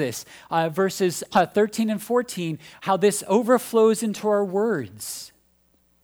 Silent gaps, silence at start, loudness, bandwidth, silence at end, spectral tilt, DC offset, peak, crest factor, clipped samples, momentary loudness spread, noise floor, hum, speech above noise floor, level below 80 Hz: none; 0 s; -23 LUFS; over 20 kHz; 0.75 s; -5 dB/octave; under 0.1%; -6 dBFS; 18 dB; under 0.1%; 12 LU; -63 dBFS; none; 41 dB; -66 dBFS